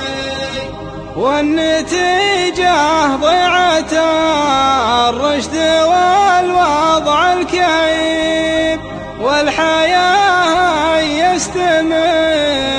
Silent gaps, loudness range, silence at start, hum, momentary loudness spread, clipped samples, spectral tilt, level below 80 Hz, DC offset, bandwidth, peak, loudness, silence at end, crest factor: none; 1 LU; 0 s; none; 7 LU; under 0.1%; -3 dB/octave; -38 dBFS; under 0.1%; 10.5 kHz; 0 dBFS; -13 LUFS; 0 s; 12 dB